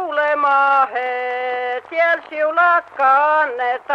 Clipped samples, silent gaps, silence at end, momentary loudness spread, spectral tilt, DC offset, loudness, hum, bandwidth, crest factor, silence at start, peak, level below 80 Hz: under 0.1%; none; 0 s; 8 LU; -3 dB/octave; under 0.1%; -17 LUFS; none; 7.6 kHz; 12 dB; 0 s; -4 dBFS; -72 dBFS